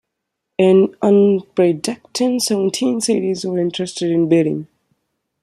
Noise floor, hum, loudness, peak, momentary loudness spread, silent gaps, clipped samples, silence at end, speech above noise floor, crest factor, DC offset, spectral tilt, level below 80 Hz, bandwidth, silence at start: -78 dBFS; none; -17 LUFS; -2 dBFS; 9 LU; none; under 0.1%; 0.8 s; 62 dB; 16 dB; under 0.1%; -5.5 dB/octave; -64 dBFS; 13.5 kHz; 0.6 s